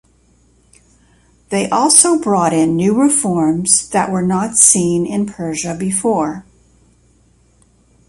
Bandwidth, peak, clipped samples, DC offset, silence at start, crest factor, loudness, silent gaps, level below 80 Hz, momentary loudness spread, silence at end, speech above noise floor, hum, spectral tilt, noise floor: 16 kHz; 0 dBFS; under 0.1%; under 0.1%; 1.5 s; 16 dB; -13 LUFS; none; -50 dBFS; 12 LU; 1.65 s; 39 dB; none; -4 dB/octave; -53 dBFS